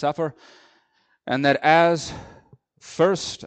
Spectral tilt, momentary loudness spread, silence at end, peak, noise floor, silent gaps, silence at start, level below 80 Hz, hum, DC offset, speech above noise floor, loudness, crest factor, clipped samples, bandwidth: -4.5 dB/octave; 22 LU; 0 s; -2 dBFS; -65 dBFS; none; 0 s; -58 dBFS; none; under 0.1%; 44 dB; -20 LUFS; 20 dB; under 0.1%; 9.2 kHz